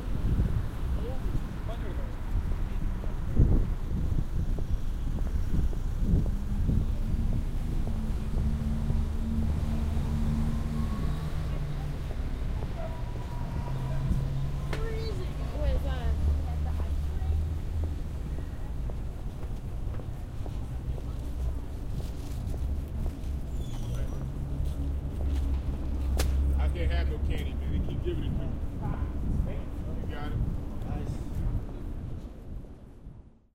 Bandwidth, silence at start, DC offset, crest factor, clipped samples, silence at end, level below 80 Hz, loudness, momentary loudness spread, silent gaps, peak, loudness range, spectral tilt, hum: 15 kHz; 0 s; under 0.1%; 18 dB; under 0.1%; 0.25 s; -30 dBFS; -33 LUFS; 8 LU; none; -12 dBFS; 5 LU; -7.5 dB/octave; none